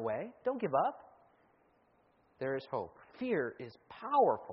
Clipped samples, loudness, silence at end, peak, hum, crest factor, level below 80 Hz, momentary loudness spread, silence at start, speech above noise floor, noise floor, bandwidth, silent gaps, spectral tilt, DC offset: under 0.1%; -35 LUFS; 0 s; -18 dBFS; none; 18 dB; -78 dBFS; 19 LU; 0 s; 36 dB; -71 dBFS; 5.6 kHz; none; -5 dB/octave; under 0.1%